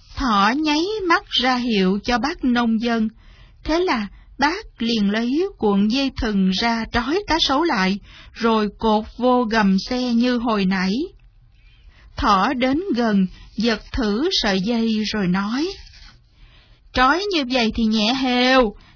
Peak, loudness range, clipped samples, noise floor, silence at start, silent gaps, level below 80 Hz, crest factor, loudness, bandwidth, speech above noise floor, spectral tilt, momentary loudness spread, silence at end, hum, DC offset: -4 dBFS; 2 LU; under 0.1%; -50 dBFS; 0.1 s; none; -40 dBFS; 16 dB; -19 LUFS; 5.4 kHz; 31 dB; -5 dB/octave; 7 LU; 0.2 s; none; under 0.1%